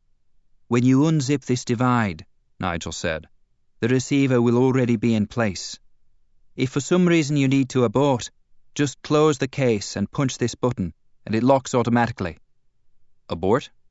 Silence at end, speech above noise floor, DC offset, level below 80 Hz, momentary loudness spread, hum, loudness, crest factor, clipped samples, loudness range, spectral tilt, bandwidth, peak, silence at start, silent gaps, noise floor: 0.25 s; 37 dB; under 0.1%; -52 dBFS; 13 LU; none; -22 LUFS; 18 dB; under 0.1%; 3 LU; -6 dB/octave; 8 kHz; -4 dBFS; 0.7 s; none; -57 dBFS